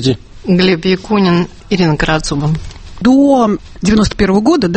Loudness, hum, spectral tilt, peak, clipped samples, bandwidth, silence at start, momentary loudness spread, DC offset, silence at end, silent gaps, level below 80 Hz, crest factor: -12 LUFS; none; -6 dB/octave; 0 dBFS; under 0.1%; 8.8 kHz; 0 s; 8 LU; under 0.1%; 0 s; none; -30 dBFS; 12 dB